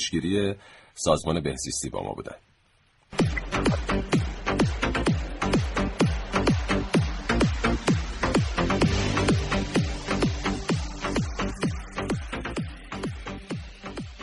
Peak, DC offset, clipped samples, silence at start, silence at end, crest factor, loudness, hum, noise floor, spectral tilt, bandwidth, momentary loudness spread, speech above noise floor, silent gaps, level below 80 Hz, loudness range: -6 dBFS; under 0.1%; under 0.1%; 0 s; 0 s; 20 dB; -27 LUFS; none; -63 dBFS; -5 dB/octave; 11.5 kHz; 11 LU; 35 dB; none; -36 dBFS; 5 LU